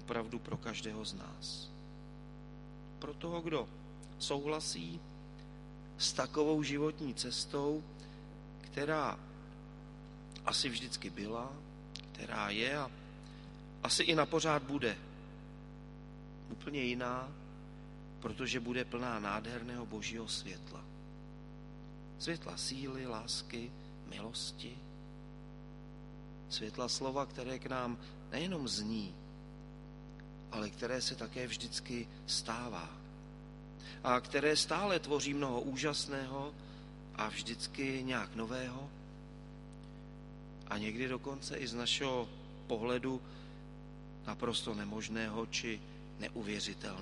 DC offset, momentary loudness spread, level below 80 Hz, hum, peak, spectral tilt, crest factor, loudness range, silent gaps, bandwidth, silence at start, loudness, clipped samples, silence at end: under 0.1%; 18 LU; -58 dBFS; 50 Hz at -55 dBFS; -14 dBFS; -3.5 dB/octave; 26 dB; 8 LU; none; 11.5 kHz; 0 s; -39 LUFS; under 0.1%; 0 s